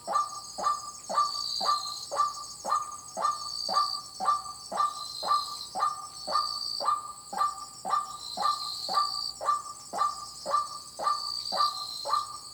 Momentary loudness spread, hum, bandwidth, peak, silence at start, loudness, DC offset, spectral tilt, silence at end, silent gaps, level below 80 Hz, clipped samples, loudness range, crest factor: 7 LU; none; over 20 kHz; -14 dBFS; 0 s; -30 LUFS; under 0.1%; 0 dB/octave; 0 s; none; -68 dBFS; under 0.1%; 1 LU; 16 dB